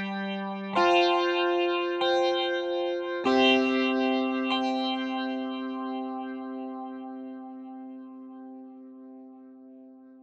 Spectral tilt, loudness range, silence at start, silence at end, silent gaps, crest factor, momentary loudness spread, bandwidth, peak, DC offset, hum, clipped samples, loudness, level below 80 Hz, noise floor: -4.5 dB/octave; 16 LU; 0 s; 0 s; none; 18 dB; 22 LU; 7.8 kHz; -10 dBFS; under 0.1%; none; under 0.1%; -27 LUFS; -76 dBFS; -50 dBFS